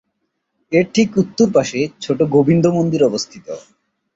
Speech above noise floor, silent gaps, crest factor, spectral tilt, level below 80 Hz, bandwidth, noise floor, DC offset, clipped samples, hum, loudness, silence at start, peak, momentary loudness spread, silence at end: 56 dB; none; 16 dB; -6 dB/octave; -54 dBFS; 8 kHz; -72 dBFS; under 0.1%; under 0.1%; none; -16 LUFS; 0.7 s; -2 dBFS; 13 LU; 0.55 s